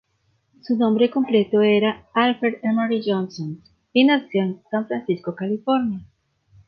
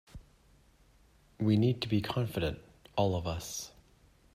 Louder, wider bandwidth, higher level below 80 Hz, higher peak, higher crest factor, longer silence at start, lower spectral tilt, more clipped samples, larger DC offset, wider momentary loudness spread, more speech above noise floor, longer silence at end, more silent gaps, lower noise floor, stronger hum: first, -21 LUFS vs -33 LUFS; second, 6.4 kHz vs 15.5 kHz; second, -64 dBFS vs -56 dBFS; first, -4 dBFS vs -16 dBFS; about the same, 18 dB vs 18 dB; first, 0.65 s vs 0.15 s; first, -7.5 dB/octave vs -6 dB/octave; neither; neither; second, 10 LU vs 13 LU; first, 47 dB vs 33 dB; about the same, 0.65 s vs 0.65 s; neither; about the same, -67 dBFS vs -64 dBFS; neither